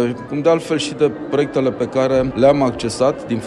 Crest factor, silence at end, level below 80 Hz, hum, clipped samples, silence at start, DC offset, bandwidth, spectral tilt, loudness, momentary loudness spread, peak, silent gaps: 16 dB; 0 s; -44 dBFS; none; under 0.1%; 0 s; under 0.1%; 11.5 kHz; -6 dB/octave; -17 LUFS; 5 LU; 0 dBFS; none